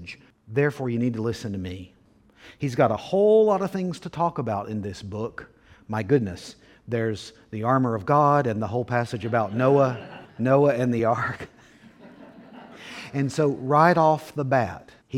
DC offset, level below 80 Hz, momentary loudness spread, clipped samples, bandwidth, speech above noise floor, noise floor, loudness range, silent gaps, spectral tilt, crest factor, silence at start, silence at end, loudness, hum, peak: under 0.1%; -60 dBFS; 18 LU; under 0.1%; 14 kHz; 32 dB; -55 dBFS; 6 LU; none; -7.5 dB/octave; 20 dB; 0 s; 0 s; -24 LUFS; none; -4 dBFS